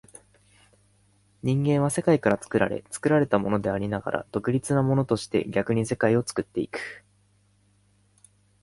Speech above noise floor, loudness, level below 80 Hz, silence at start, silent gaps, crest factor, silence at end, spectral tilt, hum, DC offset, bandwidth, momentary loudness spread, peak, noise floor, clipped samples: 39 dB; -25 LUFS; -56 dBFS; 1.45 s; none; 20 dB; 1.65 s; -6.5 dB/octave; 50 Hz at -50 dBFS; under 0.1%; 11.5 kHz; 8 LU; -6 dBFS; -64 dBFS; under 0.1%